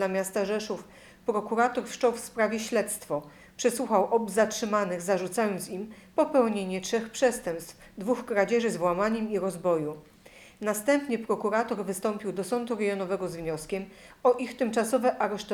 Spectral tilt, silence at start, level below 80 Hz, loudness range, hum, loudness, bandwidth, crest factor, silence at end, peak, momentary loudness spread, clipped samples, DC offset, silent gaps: -4.5 dB/octave; 0 s; -62 dBFS; 2 LU; none; -28 LUFS; 19 kHz; 18 dB; 0 s; -10 dBFS; 10 LU; under 0.1%; under 0.1%; none